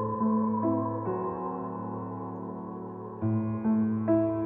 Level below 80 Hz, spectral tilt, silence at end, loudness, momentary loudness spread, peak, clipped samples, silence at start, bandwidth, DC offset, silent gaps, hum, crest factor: -64 dBFS; -12 dB/octave; 0 s; -30 LUFS; 12 LU; -14 dBFS; under 0.1%; 0 s; 2.8 kHz; under 0.1%; none; none; 14 dB